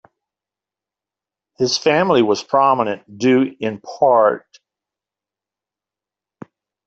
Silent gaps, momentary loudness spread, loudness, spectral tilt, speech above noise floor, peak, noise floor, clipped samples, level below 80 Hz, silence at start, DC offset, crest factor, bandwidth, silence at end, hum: none; 9 LU; -17 LUFS; -4.5 dB/octave; 72 dB; -2 dBFS; -88 dBFS; under 0.1%; -64 dBFS; 1.6 s; under 0.1%; 18 dB; 8 kHz; 2.5 s; none